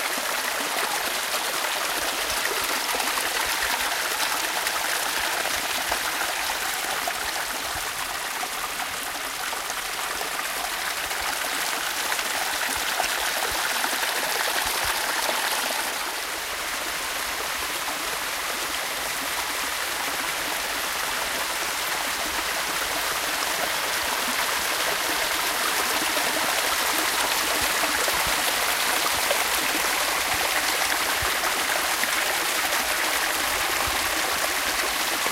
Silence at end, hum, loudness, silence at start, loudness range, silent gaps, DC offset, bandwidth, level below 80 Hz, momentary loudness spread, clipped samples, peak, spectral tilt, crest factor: 0 s; none; -24 LUFS; 0 s; 5 LU; none; under 0.1%; 17 kHz; -52 dBFS; 5 LU; under 0.1%; -8 dBFS; 0.5 dB/octave; 18 dB